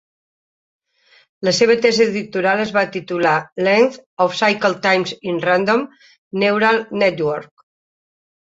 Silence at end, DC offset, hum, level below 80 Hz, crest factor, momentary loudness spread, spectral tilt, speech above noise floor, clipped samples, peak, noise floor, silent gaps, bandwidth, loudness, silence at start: 1 s; under 0.1%; none; -62 dBFS; 16 dB; 8 LU; -4.5 dB/octave; 38 dB; under 0.1%; -2 dBFS; -55 dBFS; 3.52-3.56 s, 4.06-4.17 s, 6.18-6.31 s; 8 kHz; -17 LUFS; 1.4 s